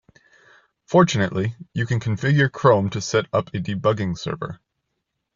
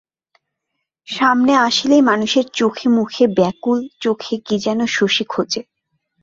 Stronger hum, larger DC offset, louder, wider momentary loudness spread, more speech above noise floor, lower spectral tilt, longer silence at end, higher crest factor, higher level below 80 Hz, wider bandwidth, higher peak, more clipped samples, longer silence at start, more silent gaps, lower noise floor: neither; neither; second, -21 LUFS vs -16 LUFS; first, 11 LU vs 8 LU; second, 57 dB vs 61 dB; first, -6 dB/octave vs -4 dB/octave; first, 0.8 s vs 0.6 s; about the same, 20 dB vs 16 dB; first, -54 dBFS vs -60 dBFS; about the same, 7.6 kHz vs 7.8 kHz; about the same, -2 dBFS vs -2 dBFS; neither; second, 0.9 s vs 1.1 s; neither; about the same, -77 dBFS vs -77 dBFS